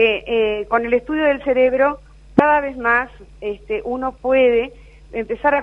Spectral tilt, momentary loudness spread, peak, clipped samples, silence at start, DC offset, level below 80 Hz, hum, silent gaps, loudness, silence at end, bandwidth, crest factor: -7 dB/octave; 14 LU; 0 dBFS; under 0.1%; 0 s; under 0.1%; -44 dBFS; none; none; -18 LUFS; 0 s; 5.4 kHz; 18 dB